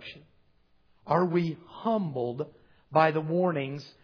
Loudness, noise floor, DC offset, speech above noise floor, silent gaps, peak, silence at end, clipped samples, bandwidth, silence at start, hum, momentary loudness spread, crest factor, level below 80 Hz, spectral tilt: -28 LUFS; -64 dBFS; under 0.1%; 36 dB; none; -8 dBFS; 0.15 s; under 0.1%; 5.4 kHz; 0 s; none; 13 LU; 22 dB; -70 dBFS; -8.5 dB/octave